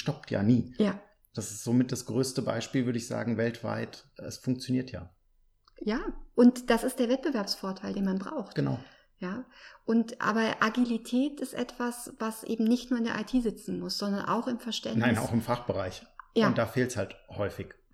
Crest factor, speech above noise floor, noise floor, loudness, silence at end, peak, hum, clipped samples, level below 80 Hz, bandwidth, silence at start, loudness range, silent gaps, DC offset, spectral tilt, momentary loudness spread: 20 dB; 37 dB; -67 dBFS; -30 LUFS; 0.2 s; -10 dBFS; none; under 0.1%; -56 dBFS; 14.5 kHz; 0 s; 4 LU; none; under 0.1%; -5.5 dB/octave; 12 LU